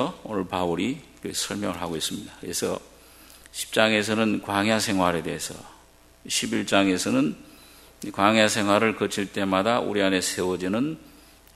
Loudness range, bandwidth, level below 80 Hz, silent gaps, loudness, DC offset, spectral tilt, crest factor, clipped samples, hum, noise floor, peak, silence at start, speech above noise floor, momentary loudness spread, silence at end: 5 LU; 15.5 kHz; -58 dBFS; none; -24 LUFS; under 0.1%; -3.5 dB/octave; 24 dB; under 0.1%; none; -54 dBFS; -2 dBFS; 0 s; 29 dB; 13 LU; 0.45 s